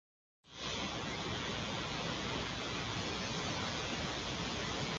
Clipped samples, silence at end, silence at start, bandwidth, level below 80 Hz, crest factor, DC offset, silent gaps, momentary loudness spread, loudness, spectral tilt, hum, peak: under 0.1%; 0 s; 0.45 s; 9.6 kHz; -54 dBFS; 16 dB; under 0.1%; none; 2 LU; -38 LUFS; -3.5 dB/octave; none; -24 dBFS